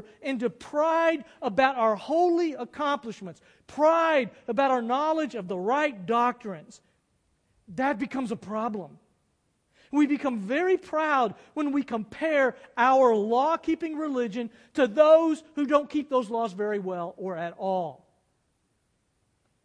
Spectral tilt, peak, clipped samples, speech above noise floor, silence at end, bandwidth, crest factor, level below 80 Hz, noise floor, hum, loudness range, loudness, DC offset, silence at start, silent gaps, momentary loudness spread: -5.5 dB/octave; -6 dBFS; under 0.1%; 47 dB; 1.7 s; 10.5 kHz; 20 dB; -70 dBFS; -73 dBFS; none; 7 LU; -26 LUFS; under 0.1%; 0.2 s; none; 12 LU